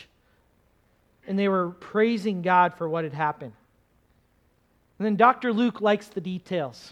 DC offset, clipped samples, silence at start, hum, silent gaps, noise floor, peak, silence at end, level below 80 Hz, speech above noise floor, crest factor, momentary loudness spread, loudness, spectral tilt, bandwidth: under 0.1%; under 0.1%; 1.25 s; none; none; -65 dBFS; -4 dBFS; 0 s; -68 dBFS; 41 dB; 22 dB; 11 LU; -25 LUFS; -7 dB/octave; 11 kHz